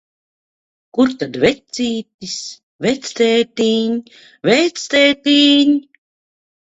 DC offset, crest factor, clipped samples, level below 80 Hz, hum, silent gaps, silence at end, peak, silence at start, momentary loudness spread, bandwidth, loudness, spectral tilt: under 0.1%; 16 dB; under 0.1%; -56 dBFS; none; 2.14-2.19 s, 2.63-2.79 s; 0.85 s; 0 dBFS; 0.95 s; 14 LU; 8 kHz; -16 LUFS; -3.5 dB/octave